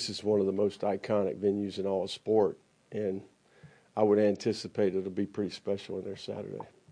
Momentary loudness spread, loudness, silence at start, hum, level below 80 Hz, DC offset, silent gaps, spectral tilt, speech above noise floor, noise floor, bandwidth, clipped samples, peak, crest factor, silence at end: 13 LU; -31 LUFS; 0 s; none; -74 dBFS; under 0.1%; none; -6 dB/octave; 28 dB; -58 dBFS; 10.5 kHz; under 0.1%; -12 dBFS; 18 dB; 0.25 s